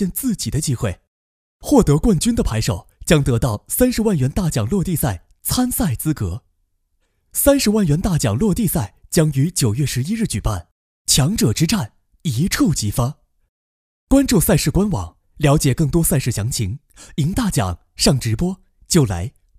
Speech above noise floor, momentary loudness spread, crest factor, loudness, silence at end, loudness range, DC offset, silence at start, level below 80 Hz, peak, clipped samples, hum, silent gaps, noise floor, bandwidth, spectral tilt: 49 dB; 11 LU; 18 dB; -18 LUFS; 0.3 s; 2 LU; under 0.1%; 0 s; -32 dBFS; 0 dBFS; under 0.1%; none; 1.08-1.60 s, 10.71-11.05 s, 13.49-14.07 s; -66 dBFS; 16 kHz; -5 dB/octave